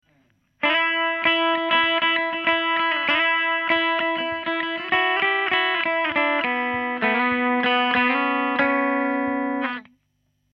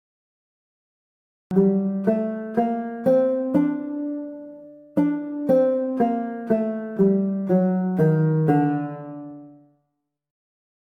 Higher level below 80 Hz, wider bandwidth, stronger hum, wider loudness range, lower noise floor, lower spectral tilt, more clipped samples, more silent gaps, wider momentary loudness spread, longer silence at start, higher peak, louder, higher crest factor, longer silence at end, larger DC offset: about the same, -64 dBFS vs -64 dBFS; first, 6 kHz vs 3.6 kHz; neither; about the same, 2 LU vs 3 LU; second, -70 dBFS vs -77 dBFS; second, -5.5 dB/octave vs -11 dB/octave; neither; neither; second, 6 LU vs 13 LU; second, 0.6 s vs 1.5 s; about the same, -6 dBFS vs -8 dBFS; about the same, -21 LUFS vs -22 LUFS; about the same, 16 dB vs 16 dB; second, 0.7 s vs 1.45 s; neither